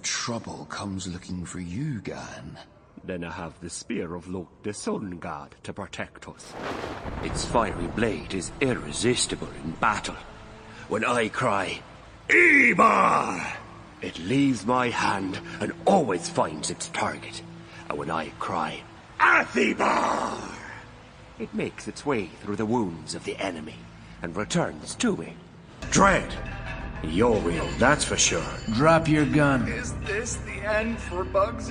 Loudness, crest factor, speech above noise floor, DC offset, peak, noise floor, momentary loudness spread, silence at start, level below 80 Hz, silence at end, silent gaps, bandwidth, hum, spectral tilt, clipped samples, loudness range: -25 LUFS; 22 dB; 21 dB; under 0.1%; -4 dBFS; -47 dBFS; 18 LU; 0 s; -44 dBFS; 0 s; none; 10.5 kHz; none; -4 dB/octave; under 0.1%; 13 LU